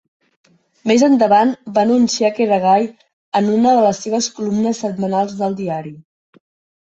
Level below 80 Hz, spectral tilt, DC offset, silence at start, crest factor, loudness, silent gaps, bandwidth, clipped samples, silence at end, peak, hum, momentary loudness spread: -60 dBFS; -5 dB/octave; under 0.1%; 0.85 s; 14 dB; -16 LUFS; 3.13-3.32 s; 8.2 kHz; under 0.1%; 0.85 s; -2 dBFS; none; 11 LU